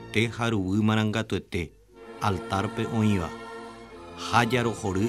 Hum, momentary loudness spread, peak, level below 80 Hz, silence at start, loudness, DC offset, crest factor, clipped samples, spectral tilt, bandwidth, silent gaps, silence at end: none; 17 LU; -6 dBFS; -52 dBFS; 0 s; -27 LUFS; under 0.1%; 22 dB; under 0.1%; -6 dB/octave; 14 kHz; none; 0 s